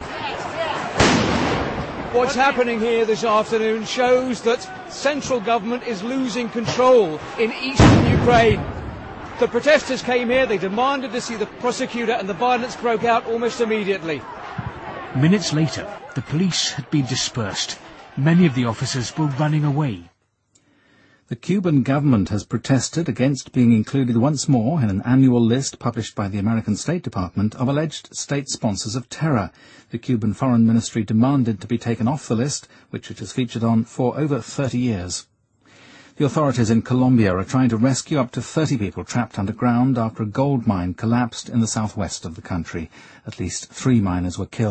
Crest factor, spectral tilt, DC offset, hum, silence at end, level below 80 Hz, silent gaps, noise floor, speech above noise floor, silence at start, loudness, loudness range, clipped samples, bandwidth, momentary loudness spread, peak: 20 dB; -5.5 dB/octave; under 0.1%; none; 0 s; -42 dBFS; none; -63 dBFS; 43 dB; 0 s; -20 LUFS; 6 LU; under 0.1%; 8.8 kHz; 11 LU; 0 dBFS